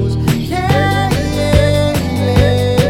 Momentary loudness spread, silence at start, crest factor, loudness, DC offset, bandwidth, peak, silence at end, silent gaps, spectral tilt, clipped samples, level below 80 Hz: 4 LU; 0 s; 12 dB; -14 LUFS; under 0.1%; 16.5 kHz; 0 dBFS; 0 s; none; -6 dB/octave; under 0.1%; -24 dBFS